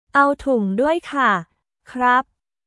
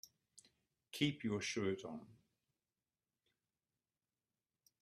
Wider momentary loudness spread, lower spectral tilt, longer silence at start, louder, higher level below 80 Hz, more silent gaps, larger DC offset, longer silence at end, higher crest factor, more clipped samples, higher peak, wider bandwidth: second, 7 LU vs 15 LU; first, -6 dB/octave vs -4.5 dB/octave; about the same, 0.15 s vs 0.05 s; first, -19 LUFS vs -41 LUFS; first, -52 dBFS vs -80 dBFS; neither; neither; second, 0.45 s vs 2.65 s; second, 18 dB vs 26 dB; neither; first, -2 dBFS vs -22 dBFS; second, 12 kHz vs 13.5 kHz